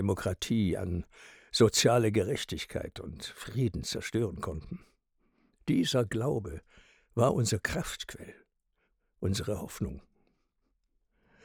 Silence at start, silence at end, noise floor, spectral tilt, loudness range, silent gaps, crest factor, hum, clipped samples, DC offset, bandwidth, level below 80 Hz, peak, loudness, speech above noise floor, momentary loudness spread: 0 s; 1.45 s; -77 dBFS; -5 dB/octave; 8 LU; none; 22 dB; none; under 0.1%; under 0.1%; over 20 kHz; -54 dBFS; -10 dBFS; -31 LUFS; 46 dB; 17 LU